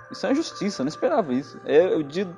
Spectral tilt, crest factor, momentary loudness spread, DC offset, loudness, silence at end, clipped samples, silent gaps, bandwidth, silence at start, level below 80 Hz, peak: -5.5 dB/octave; 18 dB; 8 LU; under 0.1%; -24 LUFS; 0 s; under 0.1%; none; 11 kHz; 0 s; -66 dBFS; -6 dBFS